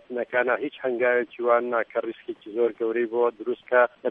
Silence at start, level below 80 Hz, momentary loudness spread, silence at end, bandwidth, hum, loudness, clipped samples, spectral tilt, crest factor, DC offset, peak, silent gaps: 0.1 s; -76 dBFS; 9 LU; 0 s; 3.8 kHz; none; -25 LUFS; under 0.1%; -7.5 dB/octave; 18 dB; under 0.1%; -6 dBFS; none